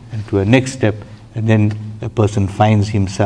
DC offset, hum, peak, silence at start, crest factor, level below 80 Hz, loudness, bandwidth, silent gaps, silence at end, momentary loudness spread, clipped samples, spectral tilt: under 0.1%; none; 0 dBFS; 0 s; 16 dB; -44 dBFS; -16 LUFS; 10 kHz; none; 0 s; 10 LU; under 0.1%; -7 dB/octave